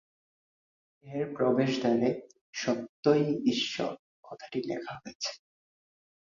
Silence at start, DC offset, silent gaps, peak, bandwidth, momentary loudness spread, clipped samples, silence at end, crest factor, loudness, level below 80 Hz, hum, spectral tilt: 1.05 s; under 0.1%; 2.41-2.53 s, 2.89-3.03 s, 3.99-4.23 s, 5.15-5.20 s; -12 dBFS; 7.4 kHz; 16 LU; under 0.1%; 0.95 s; 20 dB; -30 LUFS; -72 dBFS; none; -5.5 dB/octave